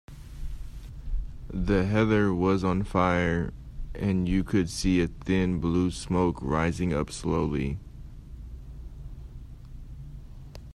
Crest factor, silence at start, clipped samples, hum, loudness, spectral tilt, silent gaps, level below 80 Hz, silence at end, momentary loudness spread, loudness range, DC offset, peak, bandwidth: 18 dB; 0.1 s; under 0.1%; none; -27 LUFS; -6.5 dB/octave; none; -38 dBFS; 0 s; 22 LU; 8 LU; under 0.1%; -10 dBFS; 12.5 kHz